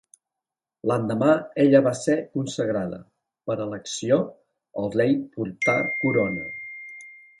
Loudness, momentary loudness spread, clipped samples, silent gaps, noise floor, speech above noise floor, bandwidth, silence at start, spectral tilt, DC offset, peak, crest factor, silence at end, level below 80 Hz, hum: -24 LUFS; 18 LU; under 0.1%; none; -88 dBFS; 65 dB; 11.5 kHz; 0.85 s; -6 dB/octave; under 0.1%; -4 dBFS; 20 dB; 0.25 s; -62 dBFS; none